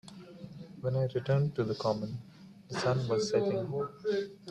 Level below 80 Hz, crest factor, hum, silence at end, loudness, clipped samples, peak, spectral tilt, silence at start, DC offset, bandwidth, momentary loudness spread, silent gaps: -66 dBFS; 16 dB; none; 0 s; -32 LUFS; under 0.1%; -16 dBFS; -6.5 dB/octave; 0.05 s; under 0.1%; 10.5 kHz; 18 LU; none